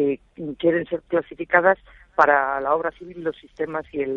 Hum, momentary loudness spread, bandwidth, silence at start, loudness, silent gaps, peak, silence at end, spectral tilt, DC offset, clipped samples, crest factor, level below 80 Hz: none; 13 LU; 7 kHz; 0 s; -22 LUFS; none; -2 dBFS; 0 s; -7.5 dB/octave; under 0.1%; under 0.1%; 20 dB; -56 dBFS